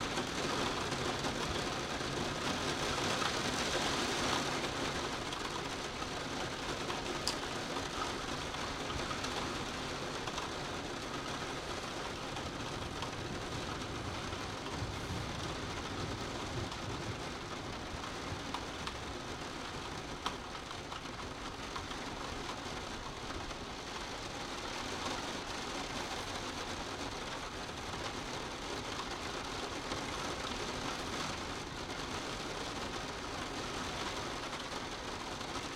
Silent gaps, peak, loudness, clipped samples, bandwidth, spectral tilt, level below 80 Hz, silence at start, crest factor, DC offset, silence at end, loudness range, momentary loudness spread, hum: none; -16 dBFS; -39 LUFS; under 0.1%; 16.5 kHz; -3.5 dB/octave; -54 dBFS; 0 s; 24 dB; under 0.1%; 0 s; 7 LU; 7 LU; none